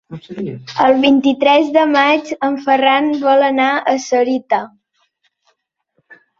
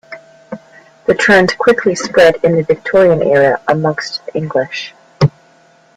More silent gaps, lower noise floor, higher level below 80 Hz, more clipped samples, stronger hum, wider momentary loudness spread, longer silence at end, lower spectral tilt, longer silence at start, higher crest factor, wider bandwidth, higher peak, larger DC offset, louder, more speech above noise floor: neither; first, -66 dBFS vs -48 dBFS; second, -62 dBFS vs -48 dBFS; neither; neither; second, 13 LU vs 16 LU; second, 0.25 s vs 0.7 s; about the same, -4.5 dB/octave vs -5.5 dB/octave; about the same, 0.1 s vs 0.1 s; about the same, 14 dB vs 14 dB; second, 7.2 kHz vs 12 kHz; about the same, 0 dBFS vs 0 dBFS; neither; about the same, -14 LUFS vs -12 LUFS; first, 52 dB vs 36 dB